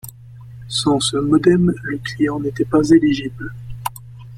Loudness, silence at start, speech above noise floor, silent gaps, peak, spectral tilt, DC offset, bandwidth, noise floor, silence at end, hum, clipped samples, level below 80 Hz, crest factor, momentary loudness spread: -17 LUFS; 0.05 s; 22 dB; none; -2 dBFS; -5.5 dB/octave; under 0.1%; 15.5 kHz; -38 dBFS; 0 s; none; under 0.1%; -44 dBFS; 16 dB; 18 LU